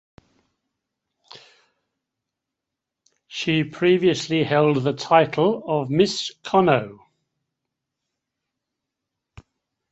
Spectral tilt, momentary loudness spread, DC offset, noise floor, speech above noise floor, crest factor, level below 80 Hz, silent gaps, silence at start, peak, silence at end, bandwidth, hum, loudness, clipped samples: -5.5 dB/octave; 7 LU; under 0.1%; -85 dBFS; 65 dB; 22 dB; -62 dBFS; none; 1.35 s; -2 dBFS; 2.95 s; 8.2 kHz; none; -20 LUFS; under 0.1%